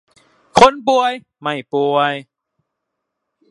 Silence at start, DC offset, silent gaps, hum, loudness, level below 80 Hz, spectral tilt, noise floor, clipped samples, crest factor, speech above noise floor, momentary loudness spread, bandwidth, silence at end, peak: 0.55 s; under 0.1%; none; none; -15 LUFS; -50 dBFS; -4 dB/octave; -77 dBFS; under 0.1%; 18 dB; 62 dB; 13 LU; 11.5 kHz; 1.3 s; 0 dBFS